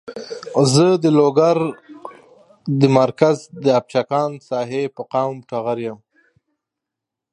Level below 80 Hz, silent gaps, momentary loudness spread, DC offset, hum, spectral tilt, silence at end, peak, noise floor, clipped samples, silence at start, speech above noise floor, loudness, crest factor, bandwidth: -66 dBFS; none; 18 LU; under 0.1%; none; -6 dB/octave; 1.35 s; 0 dBFS; -84 dBFS; under 0.1%; 0.05 s; 67 dB; -18 LUFS; 18 dB; 11.5 kHz